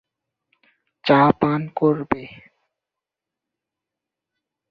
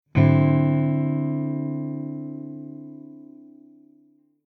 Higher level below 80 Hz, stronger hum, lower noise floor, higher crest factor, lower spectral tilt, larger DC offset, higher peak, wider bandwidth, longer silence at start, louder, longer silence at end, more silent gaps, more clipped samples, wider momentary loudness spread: about the same, -56 dBFS vs -56 dBFS; neither; first, -86 dBFS vs -59 dBFS; about the same, 22 dB vs 18 dB; second, -9 dB/octave vs -11.5 dB/octave; neither; first, -2 dBFS vs -6 dBFS; first, 5.8 kHz vs 4.3 kHz; first, 1.05 s vs 0.15 s; first, -19 LUFS vs -23 LUFS; first, 2.35 s vs 1.05 s; neither; neither; second, 12 LU vs 23 LU